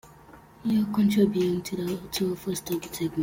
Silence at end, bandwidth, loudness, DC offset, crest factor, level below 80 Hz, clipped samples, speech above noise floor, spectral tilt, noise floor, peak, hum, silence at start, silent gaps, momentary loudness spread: 0 s; 17 kHz; -27 LUFS; under 0.1%; 16 dB; -58 dBFS; under 0.1%; 25 dB; -6 dB/octave; -51 dBFS; -10 dBFS; none; 0.05 s; none; 9 LU